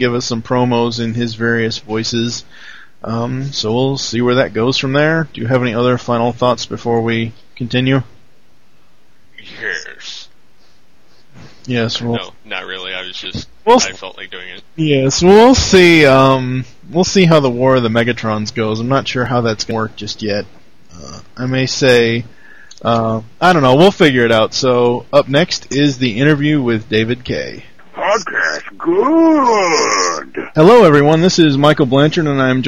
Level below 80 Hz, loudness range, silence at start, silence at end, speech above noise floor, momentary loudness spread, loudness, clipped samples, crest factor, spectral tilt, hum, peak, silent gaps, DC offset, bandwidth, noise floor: -42 dBFS; 12 LU; 0 s; 0 s; 41 dB; 15 LU; -13 LUFS; under 0.1%; 14 dB; -5 dB/octave; none; 0 dBFS; none; 1%; 14 kHz; -54 dBFS